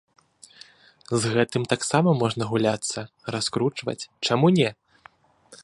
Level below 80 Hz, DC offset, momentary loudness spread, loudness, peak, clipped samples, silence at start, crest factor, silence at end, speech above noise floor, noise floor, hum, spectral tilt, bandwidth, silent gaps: -62 dBFS; under 0.1%; 11 LU; -24 LUFS; -4 dBFS; under 0.1%; 1.1 s; 20 dB; 0.1 s; 31 dB; -54 dBFS; none; -5 dB/octave; 11.5 kHz; none